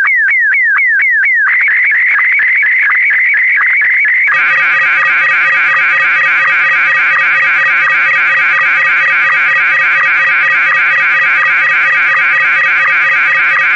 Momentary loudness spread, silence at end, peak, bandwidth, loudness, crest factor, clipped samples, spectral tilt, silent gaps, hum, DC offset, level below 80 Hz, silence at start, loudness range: 0 LU; 0 s; -4 dBFS; 7.8 kHz; -7 LUFS; 6 dB; under 0.1%; -1.5 dB/octave; none; none; 0.2%; -56 dBFS; 0 s; 0 LU